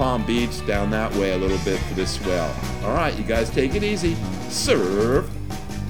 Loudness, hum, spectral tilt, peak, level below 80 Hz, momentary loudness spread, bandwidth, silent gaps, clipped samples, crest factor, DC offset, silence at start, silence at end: -23 LUFS; none; -5 dB/octave; -6 dBFS; -34 dBFS; 7 LU; 19.5 kHz; none; under 0.1%; 18 dB; 2%; 0 s; 0 s